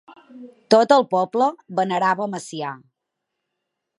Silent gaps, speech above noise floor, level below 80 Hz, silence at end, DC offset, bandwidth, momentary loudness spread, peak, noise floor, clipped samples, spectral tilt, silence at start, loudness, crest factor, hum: none; 61 dB; -74 dBFS; 1.25 s; under 0.1%; 11.5 kHz; 15 LU; 0 dBFS; -81 dBFS; under 0.1%; -5 dB/octave; 0.35 s; -20 LUFS; 20 dB; none